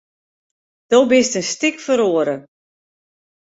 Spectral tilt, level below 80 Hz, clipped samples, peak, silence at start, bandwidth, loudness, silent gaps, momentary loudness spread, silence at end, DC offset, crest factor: -3 dB/octave; -64 dBFS; under 0.1%; -2 dBFS; 0.9 s; 8 kHz; -17 LUFS; none; 8 LU; 1 s; under 0.1%; 18 dB